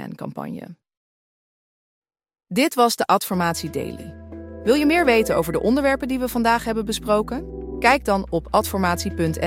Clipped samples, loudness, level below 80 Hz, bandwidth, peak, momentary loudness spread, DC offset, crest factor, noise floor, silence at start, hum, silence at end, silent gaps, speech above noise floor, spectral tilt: under 0.1%; -20 LUFS; -42 dBFS; 16.5 kHz; -2 dBFS; 15 LU; under 0.1%; 20 dB; under -90 dBFS; 0 s; none; 0 s; 0.97-2.02 s; over 69 dB; -4.5 dB/octave